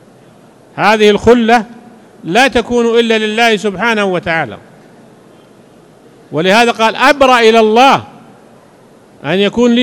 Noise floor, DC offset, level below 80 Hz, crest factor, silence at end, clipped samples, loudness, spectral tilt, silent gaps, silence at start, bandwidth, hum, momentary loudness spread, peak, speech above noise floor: -42 dBFS; under 0.1%; -42 dBFS; 12 dB; 0 s; 1%; -10 LUFS; -4.5 dB/octave; none; 0.75 s; 17.5 kHz; none; 10 LU; 0 dBFS; 32 dB